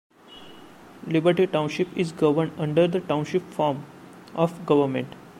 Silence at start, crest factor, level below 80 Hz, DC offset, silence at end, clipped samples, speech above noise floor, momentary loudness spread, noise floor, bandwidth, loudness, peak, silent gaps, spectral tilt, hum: 0.3 s; 18 dB; -64 dBFS; under 0.1%; 0.1 s; under 0.1%; 24 dB; 14 LU; -47 dBFS; 14.5 kHz; -24 LUFS; -6 dBFS; none; -7 dB/octave; none